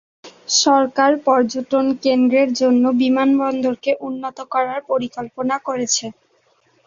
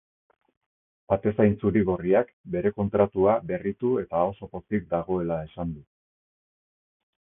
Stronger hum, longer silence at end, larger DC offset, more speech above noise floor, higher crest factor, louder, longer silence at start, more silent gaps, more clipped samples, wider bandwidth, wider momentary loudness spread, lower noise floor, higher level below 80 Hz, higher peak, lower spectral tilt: neither; second, 0.75 s vs 1.4 s; neither; second, 42 dB vs over 65 dB; about the same, 16 dB vs 20 dB; first, -18 LUFS vs -26 LUFS; second, 0.25 s vs 1.1 s; second, none vs 2.33-2.44 s; neither; first, 7.6 kHz vs 3.7 kHz; about the same, 9 LU vs 10 LU; second, -60 dBFS vs under -90 dBFS; second, -64 dBFS vs -50 dBFS; first, -2 dBFS vs -6 dBFS; second, -2.5 dB/octave vs -12.5 dB/octave